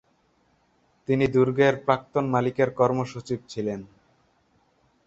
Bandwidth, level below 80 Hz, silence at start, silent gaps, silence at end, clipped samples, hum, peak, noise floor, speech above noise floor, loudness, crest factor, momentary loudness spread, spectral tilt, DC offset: 7.8 kHz; -60 dBFS; 1.1 s; none; 1.2 s; under 0.1%; none; -4 dBFS; -66 dBFS; 42 dB; -24 LUFS; 22 dB; 11 LU; -7 dB/octave; under 0.1%